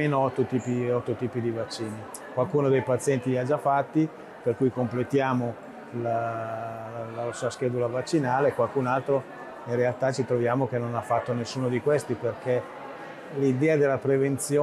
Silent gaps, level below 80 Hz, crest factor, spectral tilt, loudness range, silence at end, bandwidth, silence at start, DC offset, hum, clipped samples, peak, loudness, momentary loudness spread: none; -68 dBFS; 14 dB; -6.5 dB/octave; 3 LU; 0 s; 13.5 kHz; 0 s; under 0.1%; none; under 0.1%; -12 dBFS; -27 LUFS; 11 LU